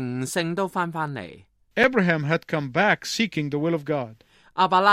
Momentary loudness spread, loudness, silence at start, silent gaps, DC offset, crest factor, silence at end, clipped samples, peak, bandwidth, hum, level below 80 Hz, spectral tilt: 12 LU; -24 LUFS; 0 s; none; under 0.1%; 20 dB; 0 s; under 0.1%; -4 dBFS; 16 kHz; none; -64 dBFS; -5 dB/octave